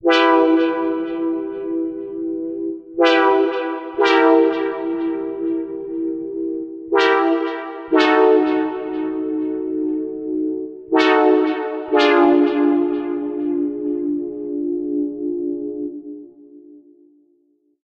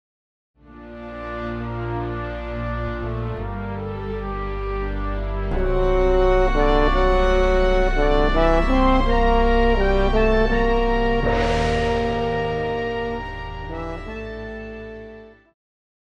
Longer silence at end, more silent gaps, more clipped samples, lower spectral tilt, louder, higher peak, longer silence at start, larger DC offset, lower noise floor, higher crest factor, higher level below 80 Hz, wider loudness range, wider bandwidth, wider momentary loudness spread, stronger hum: first, 1.05 s vs 0.75 s; neither; neither; second, -4.5 dB/octave vs -7 dB/octave; first, -19 LUFS vs -22 LUFS; about the same, -2 dBFS vs -4 dBFS; second, 0.05 s vs 0.7 s; neither; first, -62 dBFS vs -42 dBFS; about the same, 18 dB vs 16 dB; second, -60 dBFS vs -24 dBFS; second, 7 LU vs 10 LU; about the same, 7.4 kHz vs 7.4 kHz; about the same, 12 LU vs 14 LU; neither